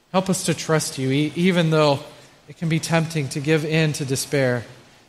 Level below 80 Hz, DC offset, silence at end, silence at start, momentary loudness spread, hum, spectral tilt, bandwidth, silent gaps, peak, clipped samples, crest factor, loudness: -58 dBFS; under 0.1%; 0.35 s; 0.15 s; 7 LU; none; -5 dB/octave; 14.5 kHz; none; -4 dBFS; under 0.1%; 18 dB; -21 LUFS